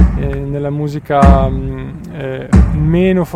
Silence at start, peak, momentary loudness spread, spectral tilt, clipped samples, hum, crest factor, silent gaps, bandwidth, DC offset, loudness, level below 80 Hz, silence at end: 0 s; 0 dBFS; 14 LU; -8.5 dB/octave; 0.1%; none; 12 dB; none; 9.8 kHz; under 0.1%; -14 LUFS; -18 dBFS; 0 s